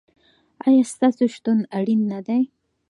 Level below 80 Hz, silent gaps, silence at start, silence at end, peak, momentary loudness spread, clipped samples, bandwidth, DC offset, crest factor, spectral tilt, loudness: -74 dBFS; none; 0.65 s; 0.45 s; -6 dBFS; 6 LU; under 0.1%; 11.5 kHz; under 0.1%; 14 dB; -6.5 dB/octave; -21 LUFS